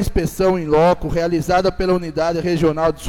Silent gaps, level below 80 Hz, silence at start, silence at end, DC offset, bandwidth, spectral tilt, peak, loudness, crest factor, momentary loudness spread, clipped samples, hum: none; -32 dBFS; 0 s; 0 s; under 0.1%; 17.5 kHz; -6.5 dB/octave; -4 dBFS; -18 LUFS; 12 dB; 5 LU; under 0.1%; none